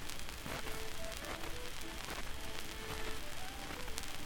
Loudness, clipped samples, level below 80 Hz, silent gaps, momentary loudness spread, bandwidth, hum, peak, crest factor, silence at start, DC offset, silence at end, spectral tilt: -44 LUFS; under 0.1%; -48 dBFS; none; 2 LU; 19 kHz; none; -14 dBFS; 26 dB; 0 s; under 0.1%; 0 s; -2.5 dB/octave